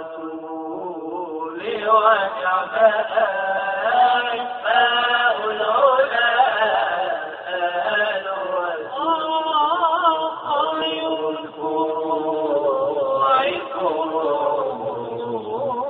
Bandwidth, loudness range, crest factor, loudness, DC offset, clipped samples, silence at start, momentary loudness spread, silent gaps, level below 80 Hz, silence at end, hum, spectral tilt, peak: 4.5 kHz; 3 LU; 18 dB; -20 LUFS; under 0.1%; under 0.1%; 0 s; 11 LU; none; -66 dBFS; 0 s; none; 0 dB/octave; -2 dBFS